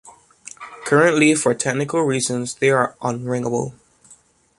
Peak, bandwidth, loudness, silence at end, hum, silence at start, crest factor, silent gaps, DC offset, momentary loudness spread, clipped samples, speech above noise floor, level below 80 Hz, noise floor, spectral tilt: -2 dBFS; 11.5 kHz; -19 LUFS; 0.85 s; none; 0.05 s; 18 dB; none; under 0.1%; 17 LU; under 0.1%; 34 dB; -60 dBFS; -52 dBFS; -4.5 dB/octave